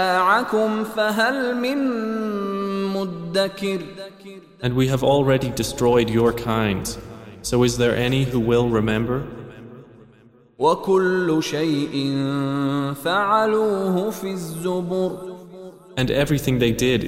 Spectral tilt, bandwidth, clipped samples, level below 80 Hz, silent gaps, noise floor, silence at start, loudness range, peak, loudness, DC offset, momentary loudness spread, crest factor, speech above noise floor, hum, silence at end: -5.5 dB/octave; 16 kHz; under 0.1%; -44 dBFS; none; -52 dBFS; 0 s; 3 LU; -6 dBFS; -21 LUFS; under 0.1%; 14 LU; 16 dB; 31 dB; none; 0 s